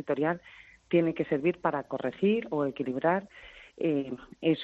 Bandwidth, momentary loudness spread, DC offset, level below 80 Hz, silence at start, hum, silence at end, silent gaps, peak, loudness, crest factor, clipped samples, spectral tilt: 6.6 kHz; 10 LU; under 0.1%; -66 dBFS; 0 s; none; 0 s; none; -12 dBFS; -30 LUFS; 18 dB; under 0.1%; -5.5 dB/octave